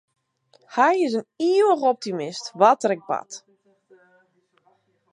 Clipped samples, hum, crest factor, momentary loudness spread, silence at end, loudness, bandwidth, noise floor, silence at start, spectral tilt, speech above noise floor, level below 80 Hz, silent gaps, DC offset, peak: under 0.1%; none; 20 dB; 12 LU; 1.75 s; -21 LUFS; 10.5 kHz; -64 dBFS; 0.7 s; -4.5 dB/octave; 44 dB; -82 dBFS; none; under 0.1%; -2 dBFS